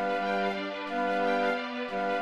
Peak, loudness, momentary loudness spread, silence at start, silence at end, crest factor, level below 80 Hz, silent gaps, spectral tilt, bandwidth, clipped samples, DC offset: -16 dBFS; -30 LUFS; 6 LU; 0 s; 0 s; 14 dB; -66 dBFS; none; -5.5 dB/octave; 12.5 kHz; under 0.1%; under 0.1%